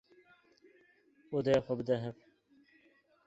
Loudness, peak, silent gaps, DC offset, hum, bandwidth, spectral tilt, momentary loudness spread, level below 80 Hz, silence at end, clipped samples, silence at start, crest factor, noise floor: -34 LUFS; -16 dBFS; none; under 0.1%; none; 8 kHz; -7 dB/octave; 8 LU; -68 dBFS; 1.15 s; under 0.1%; 1.3 s; 22 dB; -69 dBFS